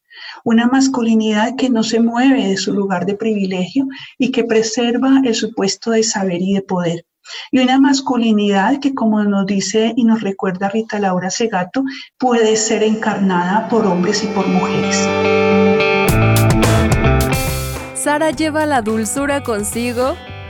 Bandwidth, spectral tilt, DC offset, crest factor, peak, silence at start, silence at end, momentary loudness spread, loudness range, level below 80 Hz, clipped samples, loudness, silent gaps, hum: 19 kHz; -5 dB/octave; under 0.1%; 14 dB; -2 dBFS; 0.15 s; 0 s; 7 LU; 3 LU; -32 dBFS; under 0.1%; -15 LUFS; none; none